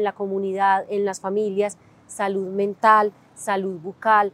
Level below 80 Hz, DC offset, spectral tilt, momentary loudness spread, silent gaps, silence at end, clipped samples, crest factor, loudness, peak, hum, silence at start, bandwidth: -74 dBFS; under 0.1%; -5 dB/octave; 11 LU; none; 0.05 s; under 0.1%; 20 dB; -22 LUFS; -2 dBFS; none; 0 s; 13 kHz